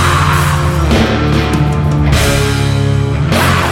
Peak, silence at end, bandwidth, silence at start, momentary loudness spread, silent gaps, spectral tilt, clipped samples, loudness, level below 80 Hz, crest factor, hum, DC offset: 0 dBFS; 0 s; 16.5 kHz; 0 s; 2 LU; none; -5.5 dB/octave; under 0.1%; -12 LUFS; -20 dBFS; 10 dB; none; under 0.1%